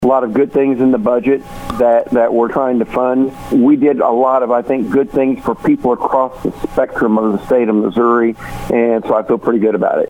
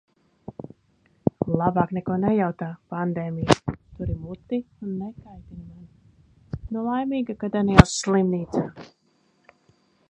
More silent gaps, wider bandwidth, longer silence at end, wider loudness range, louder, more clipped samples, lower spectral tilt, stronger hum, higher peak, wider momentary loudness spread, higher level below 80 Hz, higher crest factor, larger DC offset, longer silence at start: neither; first, 16 kHz vs 11 kHz; second, 0 s vs 1.25 s; second, 2 LU vs 9 LU; first, -14 LUFS vs -24 LUFS; neither; first, -8 dB/octave vs -6 dB/octave; neither; about the same, 0 dBFS vs 0 dBFS; second, 5 LU vs 24 LU; about the same, -40 dBFS vs -38 dBFS; second, 12 dB vs 26 dB; neither; second, 0 s vs 0.5 s